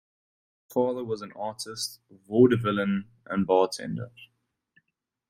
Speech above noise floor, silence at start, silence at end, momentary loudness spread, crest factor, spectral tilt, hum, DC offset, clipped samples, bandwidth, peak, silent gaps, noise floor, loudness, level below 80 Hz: 54 dB; 0.7 s; 1.05 s; 14 LU; 20 dB; -6 dB/octave; none; under 0.1%; under 0.1%; 16 kHz; -8 dBFS; none; -81 dBFS; -27 LUFS; -66 dBFS